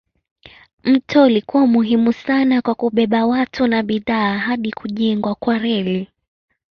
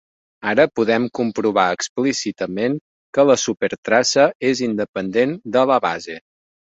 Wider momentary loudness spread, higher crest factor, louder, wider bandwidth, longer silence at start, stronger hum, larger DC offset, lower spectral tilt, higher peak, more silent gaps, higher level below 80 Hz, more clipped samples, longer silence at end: about the same, 8 LU vs 9 LU; about the same, 16 dB vs 18 dB; about the same, -17 LUFS vs -19 LUFS; second, 6.4 kHz vs 8 kHz; first, 0.85 s vs 0.4 s; neither; neither; first, -7.5 dB/octave vs -4 dB/octave; about the same, -2 dBFS vs -2 dBFS; second, none vs 1.89-1.96 s, 2.81-3.13 s, 3.78-3.83 s, 4.35-4.40 s, 4.89-4.93 s; about the same, -56 dBFS vs -60 dBFS; neither; first, 0.7 s vs 0.55 s